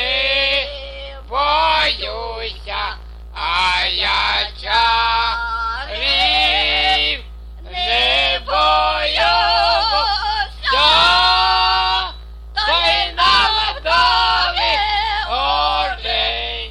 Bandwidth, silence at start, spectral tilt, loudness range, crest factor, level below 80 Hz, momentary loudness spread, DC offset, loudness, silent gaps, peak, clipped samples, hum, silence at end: 11.5 kHz; 0 s; -2.5 dB/octave; 4 LU; 16 dB; -32 dBFS; 12 LU; under 0.1%; -15 LUFS; none; -2 dBFS; under 0.1%; none; 0 s